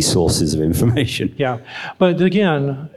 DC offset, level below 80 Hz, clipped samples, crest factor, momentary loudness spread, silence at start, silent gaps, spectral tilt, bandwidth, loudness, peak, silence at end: under 0.1%; -38 dBFS; under 0.1%; 16 dB; 7 LU; 0 s; none; -5 dB/octave; 15 kHz; -17 LUFS; -2 dBFS; 0.1 s